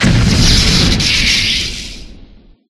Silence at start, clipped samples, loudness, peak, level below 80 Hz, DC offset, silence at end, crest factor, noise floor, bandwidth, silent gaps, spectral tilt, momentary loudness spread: 0 s; under 0.1%; -10 LUFS; 0 dBFS; -20 dBFS; under 0.1%; 0.45 s; 12 dB; -40 dBFS; 14 kHz; none; -3.5 dB/octave; 12 LU